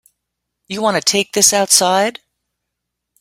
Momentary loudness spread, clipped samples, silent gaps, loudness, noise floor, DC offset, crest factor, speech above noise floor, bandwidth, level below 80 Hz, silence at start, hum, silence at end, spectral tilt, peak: 10 LU; under 0.1%; none; -13 LUFS; -78 dBFS; under 0.1%; 18 dB; 63 dB; 17 kHz; -62 dBFS; 0.7 s; 60 Hz at -45 dBFS; 1.1 s; -1.5 dB/octave; 0 dBFS